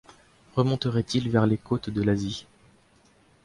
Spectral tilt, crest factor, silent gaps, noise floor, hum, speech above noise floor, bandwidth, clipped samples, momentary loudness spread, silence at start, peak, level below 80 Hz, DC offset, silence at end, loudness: -7 dB/octave; 20 dB; none; -60 dBFS; none; 35 dB; 11.5 kHz; under 0.1%; 8 LU; 0.55 s; -8 dBFS; -52 dBFS; under 0.1%; 1.05 s; -26 LUFS